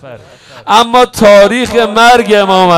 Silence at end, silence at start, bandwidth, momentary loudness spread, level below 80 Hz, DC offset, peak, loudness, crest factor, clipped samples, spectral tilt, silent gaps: 0 s; 0.05 s; 17.5 kHz; 5 LU; -38 dBFS; under 0.1%; 0 dBFS; -6 LUFS; 8 dB; 5%; -4 dB/octave; none